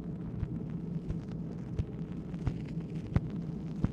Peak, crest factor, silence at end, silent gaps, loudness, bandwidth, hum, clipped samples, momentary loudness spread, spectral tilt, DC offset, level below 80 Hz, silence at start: -14 dBFS; 22 dB; 0 s; none; -38 LUFS; 7.4 kHz; none; under 0.1%; 5 LU; -9.5 dB/octave; under 0.1%; -46 dBFS; 0 s